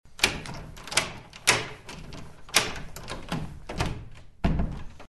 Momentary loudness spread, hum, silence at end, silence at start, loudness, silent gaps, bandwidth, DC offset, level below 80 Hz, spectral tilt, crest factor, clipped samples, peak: 18 LU; none; 0.05 s; 0.05 s; -28 LUFS; none; 12 kHz; under 0.1%; -38 dBFS; -2.5 dB/octave; 30 dB; under 0.1%; 0 dBFS